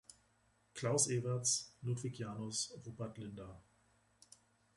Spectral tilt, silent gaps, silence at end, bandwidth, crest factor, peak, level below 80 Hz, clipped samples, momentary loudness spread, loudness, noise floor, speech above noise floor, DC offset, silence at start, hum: -3.5 dB/octave; none; 1.15 s; 11.5 kHz; 22 dB; -20 dBFS; -72 dBFS; under 0.1%; 16 LU; -39 LUFS; -75 dBFS; 35 dB; under 0.1%; 0.1 s; none